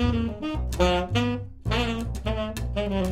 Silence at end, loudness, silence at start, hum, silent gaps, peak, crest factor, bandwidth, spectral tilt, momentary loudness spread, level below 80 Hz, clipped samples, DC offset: 0 s; -27 LUFS; 0 s; none; none; -8 dBFS; 18 dB; 15.5 kHz; -6 dB/octave; 7 LU; -32 dBFS; under 0.1%; under 0.1%